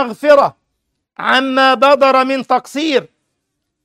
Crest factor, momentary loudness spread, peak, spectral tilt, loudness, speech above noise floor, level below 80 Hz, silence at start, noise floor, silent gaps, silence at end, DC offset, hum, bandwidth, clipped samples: 14 dB; 8 LU; 0 dBFS; -3.5 dB/octave; -13 LUFS; 60 dB; -64 dBFS; 0 s; -72 dBFS; none; 0.8 s; under 0.1%; none; 13.5 kHz; under 0.1%